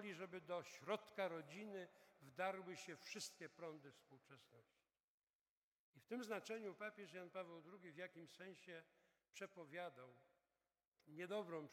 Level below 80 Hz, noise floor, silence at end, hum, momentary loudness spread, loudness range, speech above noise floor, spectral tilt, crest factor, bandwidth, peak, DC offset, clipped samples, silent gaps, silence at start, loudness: under -90 dBFS; under -90 dBFS; 0 s; none; 15 LU; 8 LU; over 37 dB; -4 dB/octave; 22 dB; 17 kHz; -32 dBFS; under 0.1%; under 0.1%; 5.00-5.93 s, 10.87-10.92 s; 0 s; -53 LUFS